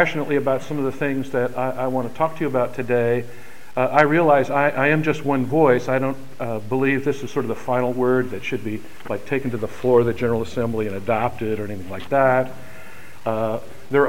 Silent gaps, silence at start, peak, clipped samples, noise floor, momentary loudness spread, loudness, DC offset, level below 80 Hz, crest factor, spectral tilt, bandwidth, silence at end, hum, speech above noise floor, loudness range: none; 0 s; 0 dBFS; under 0.1%; -42 dBFS; 13 LU; -21 LUFS; 3%; -54 dBFS; 20 dB; -7 dB/octave; 16.5 kHz; 0 s; none; 22 dB; 4 LU